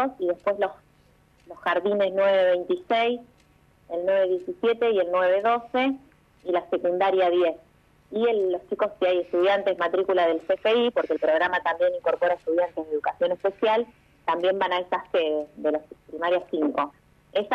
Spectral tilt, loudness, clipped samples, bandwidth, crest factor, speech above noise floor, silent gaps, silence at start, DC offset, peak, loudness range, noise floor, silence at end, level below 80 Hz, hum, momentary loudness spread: -6 dB/octave; -24 LUFS; under 0.1%; 6.4 kHz; 14 dB; 36 dB; none; 0 s; under 0.1%; -10 dBFS; 3 LU; -59 dBFS; 0 s; -66 dBFS; none; 8 LU